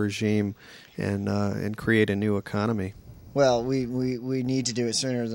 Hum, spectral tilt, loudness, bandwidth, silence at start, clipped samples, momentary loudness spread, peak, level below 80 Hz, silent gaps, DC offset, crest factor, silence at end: none; -5.5 dB/octave; -26 LUFS; 16 kHz; 0 s; under 0.1%; 10 LU; -8 dBFS; -56 dBFS; none; under 0.1%; 18 dB; 0 s